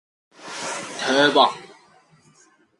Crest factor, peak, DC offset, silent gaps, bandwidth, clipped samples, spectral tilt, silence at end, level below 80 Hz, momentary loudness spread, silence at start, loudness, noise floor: 22 dB; -2 dBFS; under 0.1%; none; 11.5 kHz; under 0.1%; -2.5 dB/octave; 1.05 s; -76 dBFS; 22 LU; 0.4 s; -20 LUFS; -57 dBFS